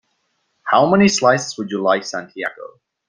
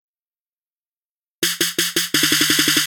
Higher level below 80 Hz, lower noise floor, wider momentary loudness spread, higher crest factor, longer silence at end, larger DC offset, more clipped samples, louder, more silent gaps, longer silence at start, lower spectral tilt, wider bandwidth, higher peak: about the same, -58 dBFS vs -60 dBFS; second, -68 dBFS vs under -90 dBFS; first, 15 LU vs 7 LU; about the same, 18 dB vs 18 dB; first, 0.4 s vs 0 s; neither; neither; about the same, -17 LUFS vs -16 LUFS; neither; second, 0.65 s vs 1.4 s; first, -4.5 dB/octave vs -0.5 dB/octave; second, 9.8 kHz vs 18.5 kHz; about the same, -2 dBFS vs -2 dBFS